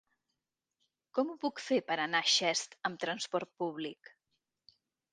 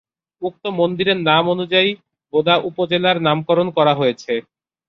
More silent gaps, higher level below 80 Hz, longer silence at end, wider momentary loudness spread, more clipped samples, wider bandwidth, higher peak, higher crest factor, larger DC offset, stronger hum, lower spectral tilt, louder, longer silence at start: neither; second, -86 dBFS vs -60 dBFS; first, 1.2 s vs 0.5 s; about the same, 11 LU vs 10 LU; neither; first, 9.6 kHz vs 7.2 kHz; second, -16 dBFS vs -2 dBFS; first, 22 dB vs 16 dB; neither; neither; second, -2 dB/octave vs -6.5 dB/octave; second, -33 LUFS vs -17 LUFS; first, 1.15 s vs 0.4 s